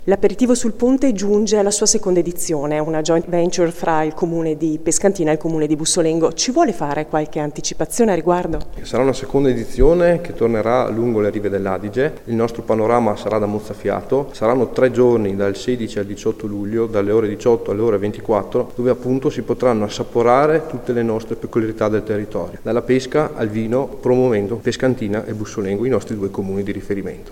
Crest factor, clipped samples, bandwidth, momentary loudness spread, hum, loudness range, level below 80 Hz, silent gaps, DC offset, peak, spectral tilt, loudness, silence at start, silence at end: 18 dB; under 0.1%; 16.5 kHz; 8 LU; none; 2 LU; -36 dBFS; none; under 0.1%; 0 dBFS; -5 dB/octave; -18 LUFS; 0 s; 0 s